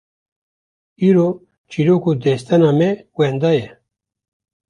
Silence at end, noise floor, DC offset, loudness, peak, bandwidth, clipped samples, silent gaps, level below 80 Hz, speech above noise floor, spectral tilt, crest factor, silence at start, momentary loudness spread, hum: 1.05 s; under -90 dBFS; under 0.1%; -16 LUFS; -2 dBFS; 10.5 kHz; under 0.1%; 1.58-1.64 s; -58 dBFS; over 75 dB; -8 dB/octave; 16 dB; 1 s; 7 LU; none